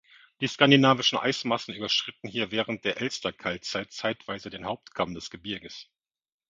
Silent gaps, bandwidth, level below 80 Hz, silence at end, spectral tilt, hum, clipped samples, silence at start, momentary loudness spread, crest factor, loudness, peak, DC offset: none; 7.6 kHz; -64 dBFS; 0.65 s; -4.5 dB/octave; none; under 0.1%; 0.4 s; 16 LU; 26 dB; -27 LUFS; -2 dBFS; under 0.1%